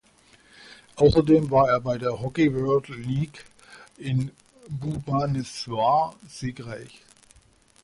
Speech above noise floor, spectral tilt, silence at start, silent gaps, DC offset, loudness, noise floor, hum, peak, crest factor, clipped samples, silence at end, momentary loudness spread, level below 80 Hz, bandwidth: 34 dB; -7 dB/octave; 0.7 s; none; under 0.1%; -24 LUFS; -58 dBFS; none; -6 dBFS; 18 dB; under 0.1%; 0.95 s; 17 LU; -48 dBFS; 11.5 kHz